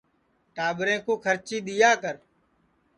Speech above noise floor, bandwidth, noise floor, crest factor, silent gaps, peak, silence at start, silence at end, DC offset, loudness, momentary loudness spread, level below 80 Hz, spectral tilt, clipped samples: 44 dB; 10.5 kHz; -69 dBFS; 20 dB; none; -6 dBFS; 0.55 s; 0.8 s; under 0.1%; -25 LUFS; 15 LU; -70 dBFS; -3 dB/octave; under 0.1%